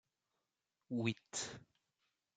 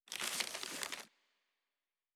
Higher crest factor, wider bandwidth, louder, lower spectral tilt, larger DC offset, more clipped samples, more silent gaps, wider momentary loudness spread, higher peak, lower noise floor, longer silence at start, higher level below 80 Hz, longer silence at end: about the same, 26 dB vs 30 dB; second, 9.6 kHz vs 19.5 kHz; about the same, -42 LUFS vs -41 LUFS; first, -4 dB/octave vs 1 dB/octave; neither; neither; neither; about the same, 9 LU vs 10 LU; second, -22 dBFS vs -16 dBFS; about the same, -90 dBFS vs under -90 dBFS; first, 0.9 s vs 0.05 s; about the same, -80 dBFS vs -84 dBFS; second, 0.75 s vs 1.05 s